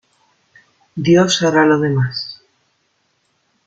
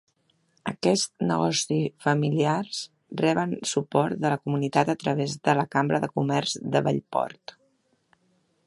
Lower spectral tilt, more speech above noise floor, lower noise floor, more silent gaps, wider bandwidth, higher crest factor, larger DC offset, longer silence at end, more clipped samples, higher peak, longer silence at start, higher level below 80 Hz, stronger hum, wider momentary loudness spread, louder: about the same, -5 dB/octave vs -5 dB/octave; first, 51 dB vs 44 dB; second, -64 dBFS vs -69 dBFS; neither; second, 9.2 kHz vs 11.5 kHz; second, 16 dB vs 22 dB; neither; about the same, 1.3 s vs 1.35 s; neither; about the same, -2 dBFS vs -4 dBFS; first, 0.95 s vs 0.65 s; first, -58 dBFS vs -66 dBFS; neither; first, 15 LU vs 9 LU; first, -15 LUFS vs -25 LUFS